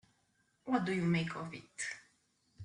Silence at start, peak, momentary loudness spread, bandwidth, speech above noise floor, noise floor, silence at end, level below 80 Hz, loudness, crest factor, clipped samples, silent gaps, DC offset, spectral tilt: 0.65 s; -18 dBFS; 15 LU; 10.5 kHz; 40 dB; -76 dBFS; 0 s; -72 dBFS; -37 LUFS; 20 dB; under 0.1%; none; under 0.1%; -5.5 dB/octave